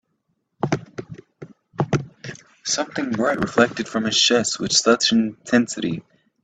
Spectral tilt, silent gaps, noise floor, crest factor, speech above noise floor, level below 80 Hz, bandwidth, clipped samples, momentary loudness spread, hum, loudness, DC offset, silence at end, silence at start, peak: -3.5 dB/octave; none; -72 dBFS; 20 dB; 52 dB; -58 dBFS; 9.4 kHz; under 0.1%; 20 LU; none; -20 LUFS; under 0.1%; 0.45 s; 0.65 s; -2 dBFS